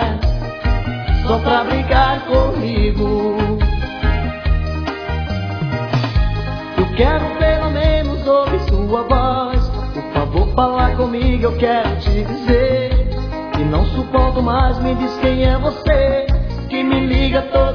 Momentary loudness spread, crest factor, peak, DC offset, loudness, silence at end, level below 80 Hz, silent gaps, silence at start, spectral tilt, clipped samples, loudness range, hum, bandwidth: 6 LU; 14 dB; -2 dBFS; under 0.1%; -17 LUFS; 0 s; -20 dBFS; none; 0 s; -8.5 dB/octave; under 0.1%; 3 LU; none; 5.4 kHz